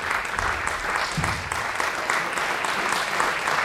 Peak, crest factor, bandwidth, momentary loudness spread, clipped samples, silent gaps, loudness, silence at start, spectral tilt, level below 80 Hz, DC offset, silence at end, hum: -6 dBFS; 18 dB; 16 kHz; 3 LU; under 0.1%; none; -24 LUFS; 0 s; -2.5 dB/octave; -46 dBFS; under 0.1%; 0 s; none